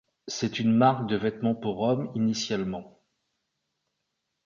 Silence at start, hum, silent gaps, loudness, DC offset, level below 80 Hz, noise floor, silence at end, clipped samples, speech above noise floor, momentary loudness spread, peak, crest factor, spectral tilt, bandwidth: 0.25 s; none; none; -27 LUFS; under 0.1%; -64 dBFS; -81 dBFS; 1.55 s; under 0.1%; 55 dB; 11 LU; -6 dBFS; 22 dB; -5.5 dB/octave; 7.4 kHz